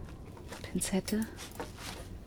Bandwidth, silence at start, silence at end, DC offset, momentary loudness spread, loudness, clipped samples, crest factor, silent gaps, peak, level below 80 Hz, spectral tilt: over 20 kHz; 0 s; 0 s; under 0.1%; 14 LU; -37 LUFS; under 0.1%; 18 dB; none; -20 dBFS; -50 dBFS; -4.5 dB/octave